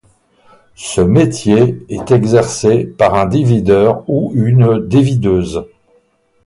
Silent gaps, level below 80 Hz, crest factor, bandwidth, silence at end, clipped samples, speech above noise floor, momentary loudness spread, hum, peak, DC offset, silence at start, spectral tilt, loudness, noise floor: none; -38 dBFS; 12 dB; 11.5 kHz; 0.8 s; under 0.1%; 44 dB; 6 LU; none; 0 dBFS; under 0.1%; 0.8 s; -7 dB/octave; -12 LUFS; -55 dBFS